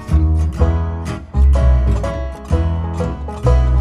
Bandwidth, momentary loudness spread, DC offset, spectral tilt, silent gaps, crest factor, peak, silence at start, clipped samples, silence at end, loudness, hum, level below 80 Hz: 7.6 kHz; 9 LU; under 0.1%; -8.5 dB/octave; none; 14 dB; -2 dBFS; 0 s; under 0.1%; 0 s; -17 LUFS; none; -16 dBFS